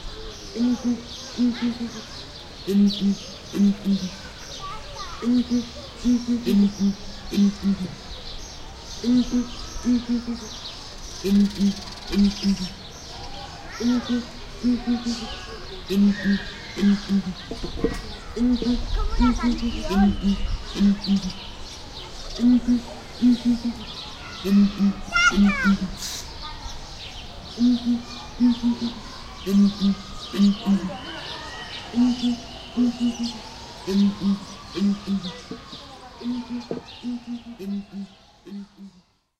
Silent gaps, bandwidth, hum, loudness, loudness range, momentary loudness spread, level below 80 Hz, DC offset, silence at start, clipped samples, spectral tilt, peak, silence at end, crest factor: none; 13.5 kHz; none; -24 LUFS; 5 LU; 17 LU; -38 dBFS; under 0.1%; 0 s; under 0.1%; -5.5 dB/octave; -6 dBFS; 0.5 s; 18 dB